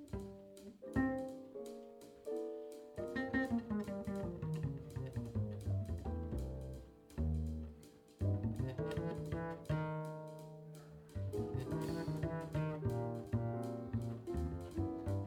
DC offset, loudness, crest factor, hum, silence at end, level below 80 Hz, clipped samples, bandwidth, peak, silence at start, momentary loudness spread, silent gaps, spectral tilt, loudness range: under 0.1%; -42 LUFS; 18 dB; none; 0 s; -52 dBFS; under 0.1%; 16 kHz; -24 dBFS; 0 s; 13 LU; none; -8 dB/octave; 2 LU